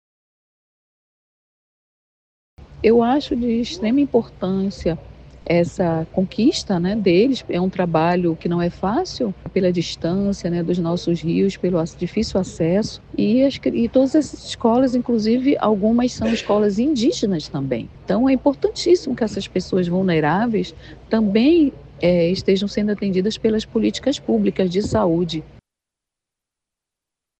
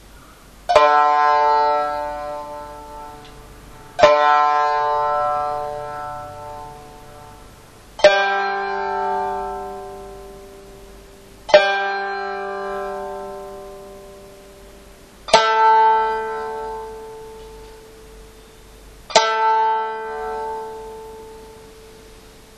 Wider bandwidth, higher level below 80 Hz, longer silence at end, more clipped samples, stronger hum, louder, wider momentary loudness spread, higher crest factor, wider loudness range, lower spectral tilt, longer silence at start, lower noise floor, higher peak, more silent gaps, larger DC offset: second, 8.8 kHz vs 14 kHz; about the same, -44 dBFS vs -48 dBFS; first, 1.9 s vs 0.4 s; neither; neither; about the same, -19 LUFS vs -18 LUFS; second, 7 LU vs 25 LU; about the same, 16 dB vs 20 dB; second, 3 LU vs 6 LU; first, -6.5 dB/octave vs -2 dB/octave; first, 2.6 s vs 0.15 s; first, -85 dBFS vs -44 dBFS; about the same, -2 dBFS vs 0 dBFS; neither; neither